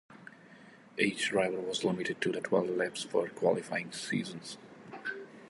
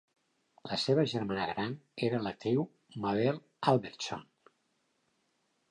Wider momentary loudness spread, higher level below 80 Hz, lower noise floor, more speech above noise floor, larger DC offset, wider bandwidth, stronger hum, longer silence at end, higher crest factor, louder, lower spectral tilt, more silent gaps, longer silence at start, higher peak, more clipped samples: first, 16 LU vs 10 LU; second, -76 dBFS vs -70 dBFS; second, -56 dBFS vs -77 dBFS; second, 23 dB vs 45 dB; neither; about the same, 11.5 kHz vs 11 kHz; neither; second, 0 s vs 1.5 s; about the same, 22 dB vs 22 dB; about the same, -33 LUFS vs -33 LUFS; second, -4 dB/octave vs -6 dB/octave; neither; second, 0.1 s vs 0.65 s; about the same, -14 dBFS vs -12 dBFS; neither